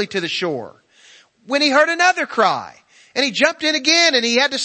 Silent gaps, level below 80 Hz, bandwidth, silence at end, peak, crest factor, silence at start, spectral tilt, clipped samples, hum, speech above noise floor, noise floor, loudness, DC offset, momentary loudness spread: none; -68 dBFS; 8.8 kHz; 0 s; 0 dBFS; 18 dB; 0 s; -1.5 dB/octave; under 0.1%; none; 32 dB; -49 dBFS; -16 LUFS; under 0.1%; 11 LU